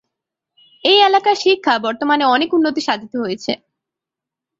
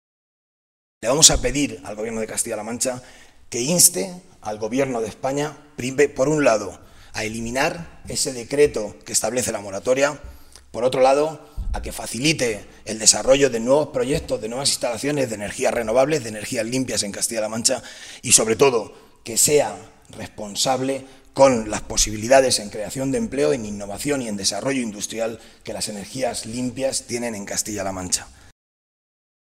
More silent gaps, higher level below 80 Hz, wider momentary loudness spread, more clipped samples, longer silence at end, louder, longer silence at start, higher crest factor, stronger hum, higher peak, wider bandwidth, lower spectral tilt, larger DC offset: neither; second, -64 dBFS vs -42 dBFS; second, 12 LU vs 15 LU; neither; second, 1.05 s vs 1.2 s; first, -16 LUFS vs -20 LUFS; second, 0.85 s vs 1 s; second, 16 dB vs 22 dB; neither; about the same, -2 dBFS vs 0 dBFS; second, 7.8 kHz vs 16 kHz; about the same, -3.5 dB/octave vs -2.5 dB/octave; neither